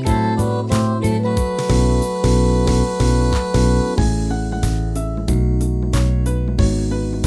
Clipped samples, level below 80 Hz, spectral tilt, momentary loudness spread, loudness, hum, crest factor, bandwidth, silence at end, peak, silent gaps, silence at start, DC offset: under 0.1%; -20 dBFS; -6.5 dB/octave; 5 LU; -18 LUFS; none; 14 dB; 11 kHz; 0 s; -4 dBFS; none; 0 s; 0.1%